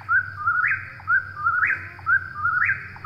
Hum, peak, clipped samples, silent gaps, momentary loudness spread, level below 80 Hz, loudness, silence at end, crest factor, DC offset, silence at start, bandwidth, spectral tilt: none; -10 dBFS; under 0.1%; none; 3 LU; -58 dBFS; -22 LUFS; 0 s; 14 dB; under 0.1%; 0 s; 6.4 kHz; -5.5 dB/octave